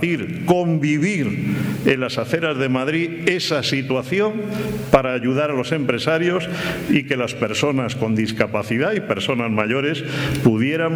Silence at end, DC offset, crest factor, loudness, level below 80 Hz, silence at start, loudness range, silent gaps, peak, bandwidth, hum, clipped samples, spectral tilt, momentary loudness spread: 0 s; under 0.1%; 20 dB; -20 LUFS; -48 dBFS; 0 s; 1 LU; none; 0 dBFS; over 20 kHz; none; under 0.1%; -6 dB/octave; 5 LU